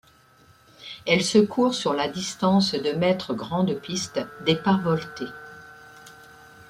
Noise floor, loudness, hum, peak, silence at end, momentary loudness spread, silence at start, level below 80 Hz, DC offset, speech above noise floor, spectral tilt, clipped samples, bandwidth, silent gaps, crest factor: -56 dBFS; -24 LUFS; none; -6 dBFS; 0.55 s; 16 LU; 0.8 s; -60 dBFS; under 0.1%; 32 dB; -5 dB/octave; under 0.1%; 13.5 kHz; none; 20 dB